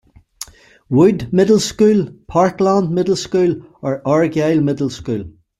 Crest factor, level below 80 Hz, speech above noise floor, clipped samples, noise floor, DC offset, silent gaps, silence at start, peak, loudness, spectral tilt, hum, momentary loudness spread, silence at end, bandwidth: 14 dB; -48 dBFS; 22 dB; under 0.1%; -37 dBFS; under 0.1%; none; 0.4 s; -2 dBFS; -16 LUFS; -6.5 dB/octave; none; 11 LU; 0.3 s; 13.5 kHz